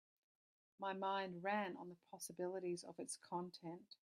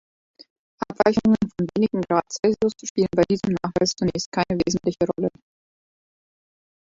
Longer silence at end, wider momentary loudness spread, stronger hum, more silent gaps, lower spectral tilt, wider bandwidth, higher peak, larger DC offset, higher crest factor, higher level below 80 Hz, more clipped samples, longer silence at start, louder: second, 0.15 s vs 1.6 s; first, 11 LU vs 5 LU; neither; second, none vs 2.90-2.95 s, 4.26-4.32 s; second, -4 dB/octave vs -5.5 dB/octave; first, 15 kHz vs 7.8 kHz; second, -28 dBFS vs -2 dBFS; neither; about the same, 20 dB vs 22 dB; second, under -90 dBFS vs -52 dBFS; neither; about the same, 0.8 s vs 0.8 s; second, -47 LUFS vs -22 LUFS